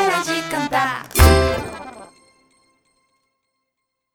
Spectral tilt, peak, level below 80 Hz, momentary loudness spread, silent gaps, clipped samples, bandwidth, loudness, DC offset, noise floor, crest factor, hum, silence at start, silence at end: -4.5 dB/octave; -2 dBFS; -28 dBFS; 19 LU; none; under 0.1%; over 20 kHz; -18 LUFS; under 0.1%; -78 dBFS; 20 dB; none; 0 s; 2.1 s